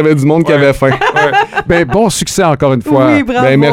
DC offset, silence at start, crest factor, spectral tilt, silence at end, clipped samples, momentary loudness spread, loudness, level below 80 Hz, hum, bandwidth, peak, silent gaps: 0.2%; 0 s; 10 dB; -5.5 dB/octave; 0 s; 1%; 3 LU; -10 LUFS; -34 dBFS; none; 16.5 kHz; 0 dBFS; none